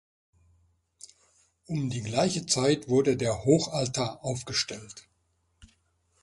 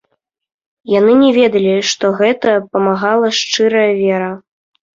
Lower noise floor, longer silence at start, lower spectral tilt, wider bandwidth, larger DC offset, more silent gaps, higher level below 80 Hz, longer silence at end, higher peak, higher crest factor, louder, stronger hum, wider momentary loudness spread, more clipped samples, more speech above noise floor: first, -73 dBFS vs -67 dBFS; first, 1.7 s vs 0.85 s; about the same, -4.5 dB/octave vs -4.5 dB/octave; first, 11.5 kHz vs 7.6 kHz; neither; neither; about the same, -58 dBFS vs -58 dBFS; first, 1.2 s vs 0.55 s; second, -10 dBFS vs -2 dBFS; first, 20 dB vs 12 dB; second, -27 LUFS vs -13 LUFS; neither; first, 11 LU vs 7 LU; neither; second, 45 dB vs 55 dB